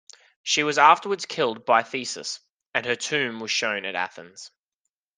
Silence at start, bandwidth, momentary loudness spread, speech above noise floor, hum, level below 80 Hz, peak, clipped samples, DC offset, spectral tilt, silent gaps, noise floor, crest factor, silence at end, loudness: 0.45 s; 10.5 kHz; 18 LU; 59 dB; none; -76 dBFS; -2 dBFS; under 0.1%; under 0.1%; -2 dB/octave; 2.51-2.57 s, 2.66-2.70 s; -83 dBFS; 24 dB; 0.7 s; -23 LUFS